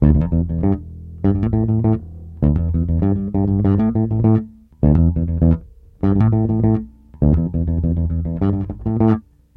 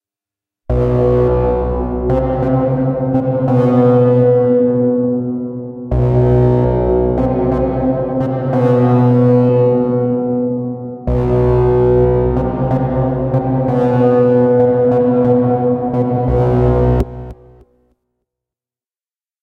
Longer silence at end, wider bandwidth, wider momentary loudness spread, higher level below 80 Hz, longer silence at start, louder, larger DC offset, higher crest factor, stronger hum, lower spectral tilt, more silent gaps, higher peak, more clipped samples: second, 0.35 s vs 2.1 s; second, 3.4 kHz vs 4.4 kHz; about the same, 7 LU vs 7 LU; about the same, -28 dBFS vs -26 dBFS; second, 0 s vs 0.7 s; second, -18 LUFS vs -14 LUFS; neither; about the same, 16 dB vs 12 dB; neither; first, -13 dB/octave vs -11.5 dB/octave; neither; about the same, 0 dBFS vs 0 dBFS; neither